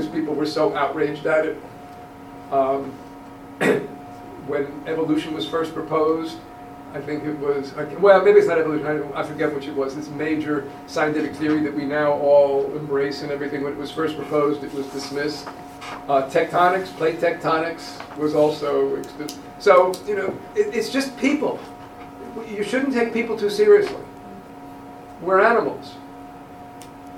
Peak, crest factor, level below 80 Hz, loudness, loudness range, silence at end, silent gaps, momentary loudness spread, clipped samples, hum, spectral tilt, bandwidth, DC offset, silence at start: 0 dBFS; 20 dB; -56 dBFS; -21 LUFS; 5 LU; 0 s; none; 23 LU; under 0.1%; none; -5.5 dB/octave; 15.5 kHz; under 0.1%; 0 s